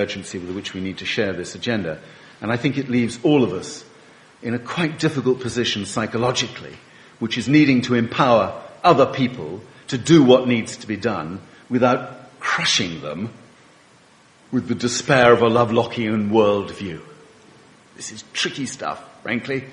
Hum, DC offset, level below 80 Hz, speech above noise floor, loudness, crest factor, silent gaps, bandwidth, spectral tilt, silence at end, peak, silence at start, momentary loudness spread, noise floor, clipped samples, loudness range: none; under 0.1%; -56 dBFS; 32 dB; -20 LUFS; 20 dB; none; 11 kHz; -5 dB/octave; 0 s; 0 dBFS; 0 s; 17 LU; -52 dBFS; under 0.1%; 6 LU